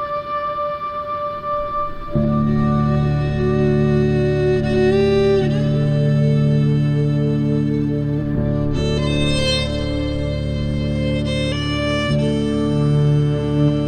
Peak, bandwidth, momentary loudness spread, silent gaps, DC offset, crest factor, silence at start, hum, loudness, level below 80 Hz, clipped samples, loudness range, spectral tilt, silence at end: -6 dBFS; 9.4 kHz; 7 LU; none; under 0.1%; 12 dB; 0 s; none; -18 LUFS; -30 dBFS; under 0.1%; 3 LU; -7.5 dB/octave; 0 s